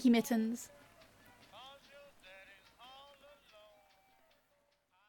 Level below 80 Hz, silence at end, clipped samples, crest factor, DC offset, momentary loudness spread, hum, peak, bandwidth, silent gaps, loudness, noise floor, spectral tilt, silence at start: -78 dBFS; 3.4 s; under 0.1%; 20 dB; under 0.1%; 27 LU; none; -20 dBFS; 17.5 kHz; none; -34 LUFS; -76 dBFS; -4.5 dB/octave; 0 s